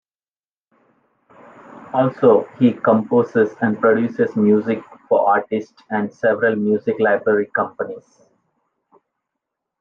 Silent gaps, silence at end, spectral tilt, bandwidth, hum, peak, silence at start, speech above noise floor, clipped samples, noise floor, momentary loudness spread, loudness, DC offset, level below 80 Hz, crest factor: none; 1.8 s; -9 dB/octave; 6.8 kHz; none; -2 dBFS; 1.75 s; over 73 dB; under 0.1%; under -90 dBFS; 10 LU; -18 LUFS; under 0.1%; -70 dBFS; 16 dB